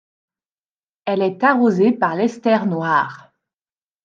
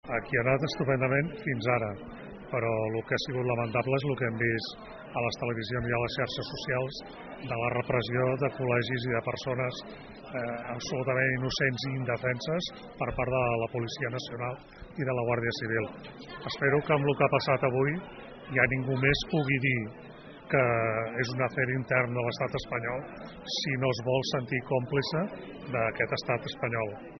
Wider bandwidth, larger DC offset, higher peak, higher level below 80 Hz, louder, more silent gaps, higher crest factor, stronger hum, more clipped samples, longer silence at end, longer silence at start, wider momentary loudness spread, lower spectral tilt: first, 7.4 kHz vs 6.4 kHz; neither; first, -2 dBFS vs -6 dBFS; second, -74 dBFS vs -54 dBFS; first, -18 LUFS vs -30 LUFS; neither; second, 16 dB vs 24 dB; neither; neither; first, 0.9 s vs 0 s; first, 1.05 s vs 0.05 s; second, 8 LU vs 12 LU; first, -7 dB/octave vs -4.5 dB/octave